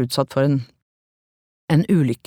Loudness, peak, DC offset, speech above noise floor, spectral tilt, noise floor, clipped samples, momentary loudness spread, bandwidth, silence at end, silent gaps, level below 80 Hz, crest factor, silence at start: -20 LUFS; -4 dBFS; under 0.1%; over 71 dB; -7 dB/octave; under -90 dBFS; under 0.1%; 7 LU; 17 kHz; 0.1 s; 0.82-1.68 s; -60 dBFS; 18 dB; 0 s